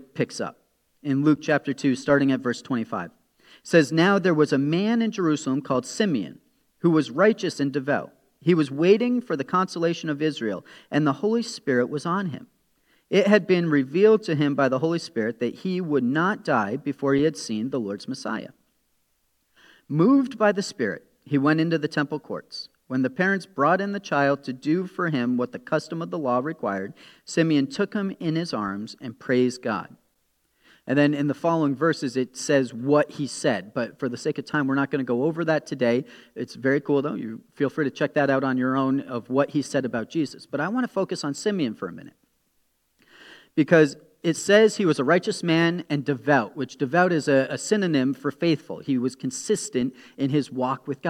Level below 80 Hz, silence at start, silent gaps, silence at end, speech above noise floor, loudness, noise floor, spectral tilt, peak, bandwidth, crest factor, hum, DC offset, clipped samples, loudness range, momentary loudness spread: -70 dBFS; 0.15 s; none; 0 s; 47 dB; -24 LUFS; -70 dBFS; -6 dB/octave; -2 dBFS; 12.5 kHz; 22 dB; none; under 0.1%; under 0.1%; 4 LU; 10 LU